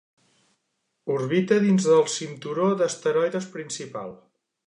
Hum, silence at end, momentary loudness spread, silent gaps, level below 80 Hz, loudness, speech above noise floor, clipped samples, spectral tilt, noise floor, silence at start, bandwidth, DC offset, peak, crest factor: none; 0.5 s; 15 LU; none; -76 dBFS; -23 LUFS; 53 dB; under 0.1%; -5.5 dB/octave; -76 dBFS; 1.05 s; 10.5 kHz; under 0.1%; -6 dBFS; 18 dB